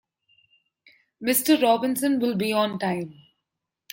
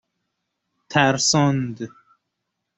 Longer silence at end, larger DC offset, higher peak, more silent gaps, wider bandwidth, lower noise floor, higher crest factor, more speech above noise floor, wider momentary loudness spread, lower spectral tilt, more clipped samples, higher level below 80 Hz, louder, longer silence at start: about the same, 0.8 s vs 0.9 s; neither; second, -8 dBFS vs -2 dBFS; neither; first, 16.5 kHz vs 8.2 kHz; first, -84 dBFS vs -79 dBFS; about the same, 18 dB vs 22 dB; about the same, 61 dB vs 59 dB; second, 11 LU vs 17 LU; about the same, -4 dB/octave vs -4 dB/octave; neither; second, -70 dBFS vs -58 dBFS; second, -23 LUFS vs -19 LUFS; first, 1.2 s vs 0.9 s